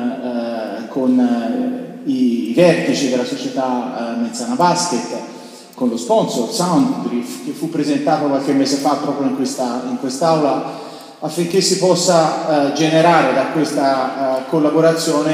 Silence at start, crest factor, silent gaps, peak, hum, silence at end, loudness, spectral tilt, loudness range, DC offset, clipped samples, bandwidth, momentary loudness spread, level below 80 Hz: 0 s; 16 dB; none; 0 dBFS; none; 0 s; -17 LUFS; -4.5 dB/octave; 4 LU; under 0.1%; under 0.1%; 15.5 kHz; 11 LU; -70 dBFS